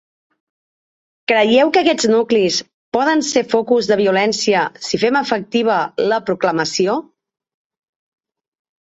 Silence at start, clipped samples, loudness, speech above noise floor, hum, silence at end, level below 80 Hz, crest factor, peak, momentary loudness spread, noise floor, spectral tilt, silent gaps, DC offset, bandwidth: 1.3 s; under 0.1%; -16 LUFS; over 75 dB; none; 1.8 s; -60 dBFS; 16 dB; -2 dBFS; 6 LU; under -90 dBFS; -3.5 dB/octave; 2.74-2.92 s; under 0.1%; 8 kHz